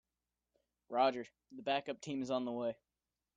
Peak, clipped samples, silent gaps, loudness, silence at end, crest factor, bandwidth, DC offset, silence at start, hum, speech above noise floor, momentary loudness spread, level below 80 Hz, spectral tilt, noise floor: -20 dBFS; under 0.1%; none; -38 LUFS; 0.65 s; 20 dB; 9 kHz; under 0.1%; 0.9 s; none; over 52 dB; 13 LU; -80 dBFS; -5 dB/octave; under -90 dBFS